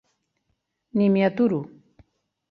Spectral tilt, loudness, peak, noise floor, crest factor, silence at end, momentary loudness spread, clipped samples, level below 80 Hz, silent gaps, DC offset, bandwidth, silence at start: -10 dB/octave; -22 LUFS; -8 dBFS; -75 dBFS; 18 dB; 0.85 s; 10 LU; under 0.1%; -66 dBFS; none; under 0.1%; 5.2 kHz; 0.95 s